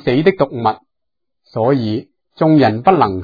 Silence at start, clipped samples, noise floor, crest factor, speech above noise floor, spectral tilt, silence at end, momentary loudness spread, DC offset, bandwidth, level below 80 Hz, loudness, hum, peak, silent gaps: 0.05 s; under 0.1%; -82 dBFS; 16 dB; 68 dB; -9.5 dB/octave; 0 s; 12 LU; under 0.1%; 5 kHz; -52 dBFS; -15 LUFS; none; 0 dBFS; none